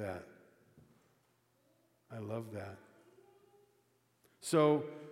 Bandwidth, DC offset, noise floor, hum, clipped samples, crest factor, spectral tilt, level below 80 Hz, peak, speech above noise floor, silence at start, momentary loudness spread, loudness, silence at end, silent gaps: 16 kHz; under 0.1%; -75 dBFS; none; under 0.1%; 24 dB; -6 dB/octave; -86 dBFS; -16 dBFS; 40 dB; 0 s; 21 LU; -35 LUFS; 0 s; none